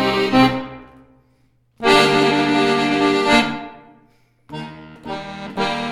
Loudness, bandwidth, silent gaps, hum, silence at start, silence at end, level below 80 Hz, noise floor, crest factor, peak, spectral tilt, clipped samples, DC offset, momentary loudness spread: -16 LUFS; 16 kHz; none; none; 0 s; 0 s; -48 dBFS; -59 dBFS; 18 dB; -2 dBFS; -4.5 dB/octave; under 0.1%; under 0.1%; 21 LU